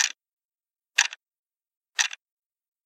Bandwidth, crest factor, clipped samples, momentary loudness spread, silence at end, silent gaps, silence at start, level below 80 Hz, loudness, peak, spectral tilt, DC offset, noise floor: 16 kHz; 30 dB; under 0.1%; 21 LU; 0.75 s; 0.33-0.37 s, 0.45-0.49 s, 1.38-1.50 s, 1.77-1.81 s; 0 s; under -90 dBFS; -26 LUFS; -2 dBFS; 8.5 dB/octave; under 0.1%; under -90 dBFS